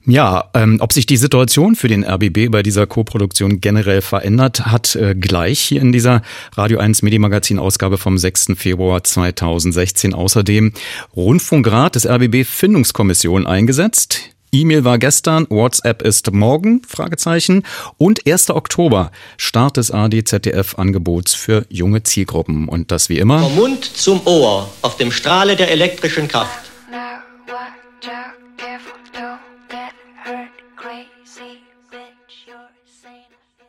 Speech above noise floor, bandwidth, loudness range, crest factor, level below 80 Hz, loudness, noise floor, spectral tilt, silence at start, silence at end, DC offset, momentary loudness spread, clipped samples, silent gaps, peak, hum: 42 dB; 16.5 kHz; 18 LU; 14 dB; -40 dBFS; -13 LUFS; -55 dBFS; -4.5 dB/octave; 0.05 s; 1.65 s; under 0.1%; 19 LU; under 0.1%; none; 0 dBFS; none